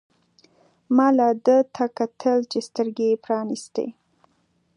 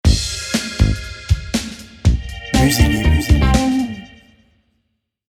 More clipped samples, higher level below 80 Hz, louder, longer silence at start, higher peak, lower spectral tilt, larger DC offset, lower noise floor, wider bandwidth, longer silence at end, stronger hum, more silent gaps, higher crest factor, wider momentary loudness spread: neither; second, -78 dBFS vs -22 dBFS; second, -22 LUFS vs -17 LUFS; first, 0.9 s vs 0.05 s; second, -4 dBFS vs 0 dBFS; about the same, -5.5 dB/octave vs -5 dB/octave; neither; second, -66 dBFS vs -70 dBFS; second, 11 kHz vs 19 kHz; second, 0.85 s vs 1.25 s; neither; neither; about the same, 18 dB vs 18 dB; about the same, 11 LU vs 10 LU